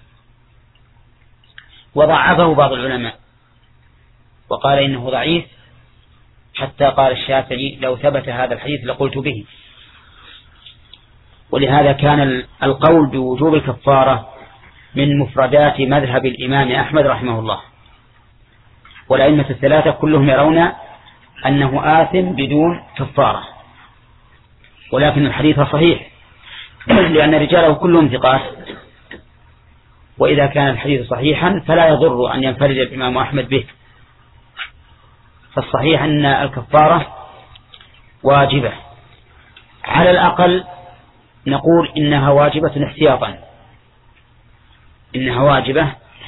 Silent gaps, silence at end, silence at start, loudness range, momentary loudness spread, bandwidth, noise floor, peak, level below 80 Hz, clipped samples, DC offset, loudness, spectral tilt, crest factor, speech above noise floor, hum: none; 0 s; 1.95 s; 6 LU; 13 LU; 4.1 kHz; -52 dBFS; 0 dBFS; -42 dBFS; under 0.1%; under 0.1%; -14 LUFS; -10 dB/octave; 16 dB; 38 dB; none